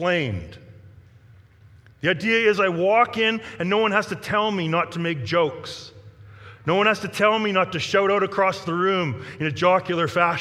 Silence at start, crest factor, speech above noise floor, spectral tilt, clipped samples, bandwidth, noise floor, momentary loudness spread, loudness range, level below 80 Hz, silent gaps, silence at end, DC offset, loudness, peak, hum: 0 s; 20 dB; 29 dB; -5.5 dB/octave; under 0.1%; 14 kHz; -50 dBFS; 9 LU; 3 LU; -58 dBFS; none; 0 s; under 0.1%; -21 LUFS; -4 dBFS; none